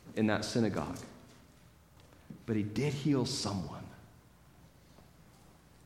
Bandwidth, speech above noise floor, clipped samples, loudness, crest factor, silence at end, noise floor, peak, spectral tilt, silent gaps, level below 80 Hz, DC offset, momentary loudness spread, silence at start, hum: 16.5 kHz; 27 dB; under 0.1%; -34 LUFS; 22 dB; 0.85 s; -60 dBFS; -16 dBFS; -5.5 dB/octave; none; -62 dBFS; under 0.1%; 21 LU; 0.05 s; none